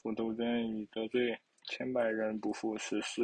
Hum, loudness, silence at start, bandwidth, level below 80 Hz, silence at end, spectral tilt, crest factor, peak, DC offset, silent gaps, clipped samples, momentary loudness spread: none; -36 LUFS; 0.05 s; 9.6 kHz; -72 dBFS; 0 s; -4.5 dB/octave; 16 dB; -20 dBFS; under 0.1%; none; under 0.1%; 6 LU